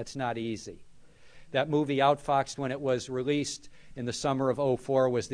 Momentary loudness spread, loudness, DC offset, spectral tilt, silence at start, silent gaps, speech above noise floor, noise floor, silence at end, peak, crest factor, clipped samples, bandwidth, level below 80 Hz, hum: 12 LU; -29 LUFS; under 0.1%; -5 dB/octave; 0 s; none; 22 dB; -51 dBFS; 0 s; -10 dBFS; 18 dB; under 0.1%; 11 kHz; -58 dBFS; none